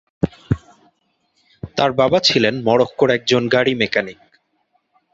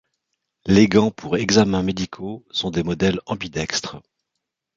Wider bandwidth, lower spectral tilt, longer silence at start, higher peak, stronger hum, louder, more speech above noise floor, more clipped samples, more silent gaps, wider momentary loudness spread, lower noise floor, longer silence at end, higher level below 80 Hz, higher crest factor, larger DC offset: about the same, 8 kHz vs 7.8 kHz; about the same, -5 dB/octave vs -5 dB/octave; second, 0.25 s vs 0.65 s; about the same, -2 dBFS vs -2 dBFS; neither; first, -17 LUFS vs -20 LUFS; second, 50 dB vs 61 dB; neither; neither; about the same, 11 LU vs 12 LU; second, -66 dBFS vs -80 dBFS; first, 1 s vs 0.8 s; about the same, -46 dBFS vs -46 dBFS; about the same, 18 dB vs 20 dB; neither